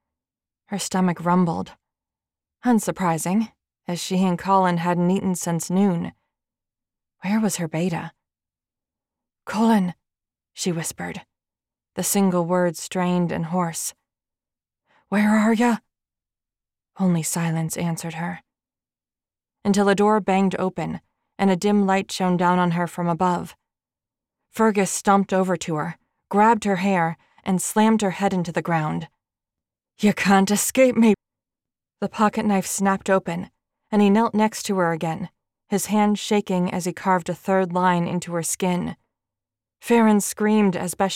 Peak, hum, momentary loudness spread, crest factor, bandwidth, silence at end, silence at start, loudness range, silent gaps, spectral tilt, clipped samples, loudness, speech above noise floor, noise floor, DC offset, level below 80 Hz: -6 dBFS; none; 13 LU; 16 dB; 16.5 kHz; 0 s; 0.7 s; 5 LU; none; -5.5 dB/octave; under 0.1%; -22 LUFS; over 69 dB; under -90 dBFS; under 0.1%; -62 dBFS